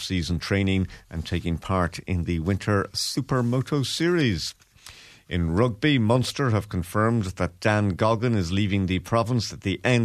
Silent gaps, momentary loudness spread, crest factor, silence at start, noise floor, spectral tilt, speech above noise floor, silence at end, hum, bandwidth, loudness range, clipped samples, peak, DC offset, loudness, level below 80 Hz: none; 7 LU; 18 dB; 0 s; -48 dBFS; -6 dB/octave; 24 dB; 0 s; none; 14 kHz; 3 LU; under 0.1%; -6 dBFS; under 0.1%; -25 LUFS; -44 dBFS